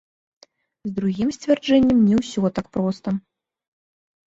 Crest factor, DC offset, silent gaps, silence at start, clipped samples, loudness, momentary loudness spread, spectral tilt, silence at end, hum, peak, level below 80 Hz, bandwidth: 18 dB; under 0.1%; none; 0.85 s; under 0.1%; -21 LUFS; 12 LU; -7 dB/octave; 1.1 s; none; -6 dBFS; -52 dBFS; 8 kHz